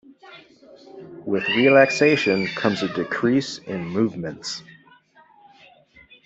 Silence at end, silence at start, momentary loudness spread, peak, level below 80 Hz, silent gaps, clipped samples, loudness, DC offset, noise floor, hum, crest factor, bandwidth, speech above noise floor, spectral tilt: 1.65 s; 0.25 s; 16 LU; -2 dBFS; -64 dBFS; none; under 0.1%; -21 LUFS; under 0.1%; -54 dBFS; none; 20 dB; 8.2 kHz; 33 dB; -5 dB/octave